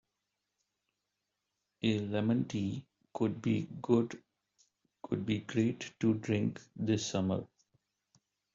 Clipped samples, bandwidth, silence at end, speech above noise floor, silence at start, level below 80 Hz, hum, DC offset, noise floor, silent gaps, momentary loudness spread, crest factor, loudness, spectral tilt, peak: under 0.1%; 7.6 kHz; 1.1 s; 53 dB; 1.85 s; -70 dBFS; none; under 0.1%; -86 dBFS; none; 8 LU; 22 dB; -34 LUFS; -6.5 dB/octave; -14 dBFS